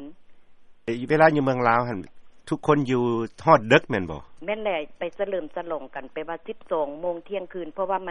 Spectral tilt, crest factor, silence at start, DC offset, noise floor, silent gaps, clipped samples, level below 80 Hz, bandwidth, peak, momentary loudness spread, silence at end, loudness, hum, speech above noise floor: -7 dB/octave; 24 dB; 0 s; under 0.1%; -47 dBFS; none; under 0.1%; -56 dBFS; 11 kHz; -2 dBFS; 16 LU; 0 s; -24 LUFS; none; 23 dB